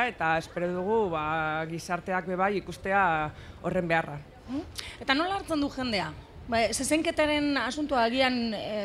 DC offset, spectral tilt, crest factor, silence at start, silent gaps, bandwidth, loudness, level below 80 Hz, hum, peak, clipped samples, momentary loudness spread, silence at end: under 0.1%; -4 dB/octave; 20 dB; 0 s; none; 14.5 kHz; -28 LUFS; -52 dBFS; none; -8 dBFS; under 0.1%; 11 LU; 0 s